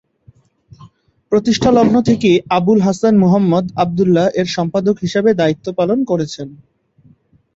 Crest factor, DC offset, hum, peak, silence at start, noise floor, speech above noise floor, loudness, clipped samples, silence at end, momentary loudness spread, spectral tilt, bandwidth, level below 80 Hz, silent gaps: 14 dB; under 0.1%; none; -2 dBFS; 0.8 s; -51 dBFS; 37 dB; -14 LUFS; under 0.1%; 1 s; 7 LU; -6.5 dB/octave; 8 kHz; -48 dBFS; none